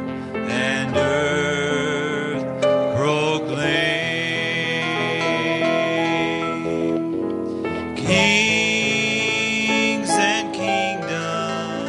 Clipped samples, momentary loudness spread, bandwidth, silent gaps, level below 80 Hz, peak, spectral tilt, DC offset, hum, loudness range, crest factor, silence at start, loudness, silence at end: under 0.1%; 7 LU; 11.5 kHz; none; -56 dBFS; -4 dBFS; -4 dB/octave; under 0.1%; none; 3 LU; 18 dB; 0 s; -20 LUFS; 0 s